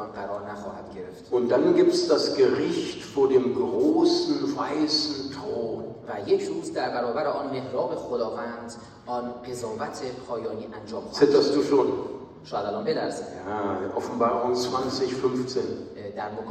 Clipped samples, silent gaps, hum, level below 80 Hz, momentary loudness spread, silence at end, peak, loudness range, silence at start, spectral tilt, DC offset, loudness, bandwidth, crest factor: under 0.1%; none; none; -62 dBFS; 14 LU; 0 s; -6 dBFS; 7 LU; 0 s; -5 dB/octave; under 0.1%; -26 LUFS; 12 kHz; 20 dB